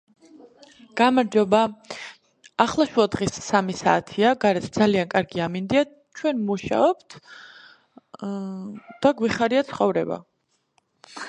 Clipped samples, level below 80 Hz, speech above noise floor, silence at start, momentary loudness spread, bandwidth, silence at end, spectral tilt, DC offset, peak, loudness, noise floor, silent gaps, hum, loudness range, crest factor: under 0.1%; -58 dBFS; 46 dB; 0.95 s; 17 LU; 10.5 kHz; 0 s; -5.5 dB/octave; under 0.1%; -2 dBFS; -22 LUFS; -68 dBFS; none; none; 4 LU; 22 dB